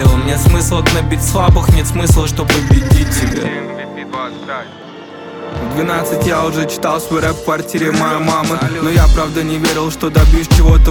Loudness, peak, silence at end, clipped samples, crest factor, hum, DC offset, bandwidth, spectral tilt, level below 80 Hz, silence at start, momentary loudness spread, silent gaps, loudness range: -13 LUFS; 0 dBFS; 0 s; under 0.1%; 12 dB; none; under 0.1%; 19 kHz; -5.5 dB/octave; -16 dBFS; 0 s; 14 LU; none; 7 LU